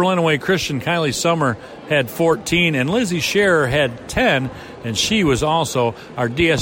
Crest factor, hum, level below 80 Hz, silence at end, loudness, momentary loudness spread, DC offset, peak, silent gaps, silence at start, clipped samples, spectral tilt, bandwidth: 12 dB; none; -42 dBFS; 0 s; -18 LUFS; 6 LU; under 0.1%; -6 dBFS; none; 0 s; under 0.1%; -4.5 dB/octave; 16.5 kHz